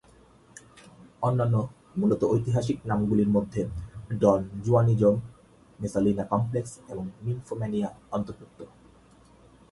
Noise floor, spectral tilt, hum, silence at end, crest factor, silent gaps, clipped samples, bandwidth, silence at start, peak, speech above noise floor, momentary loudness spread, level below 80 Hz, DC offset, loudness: -56 dBFS; -8.5 dB/octave; none; 1.05 s; 20 dB; none; under 0.1%; 11.5 kHz; 1 s; -6 dBFS; 30 dB; 15 LU; -52 dBFS; under 0.1%; -27 LUFS